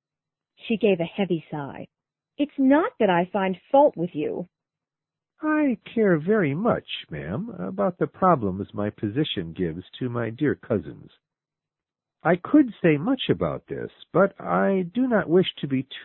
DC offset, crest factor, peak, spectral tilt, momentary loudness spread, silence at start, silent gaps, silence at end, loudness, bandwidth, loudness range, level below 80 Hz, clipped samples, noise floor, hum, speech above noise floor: under 0.1%; 20 dB; -6 dBFS; -11.5 dB/octave; 12 LU; 0.65 s; none; 0 s; -24 LUFS; 4.2 kHz; 3 LU; -56 dBFS; under 0.1%; -89 dBFS; none; 66 dB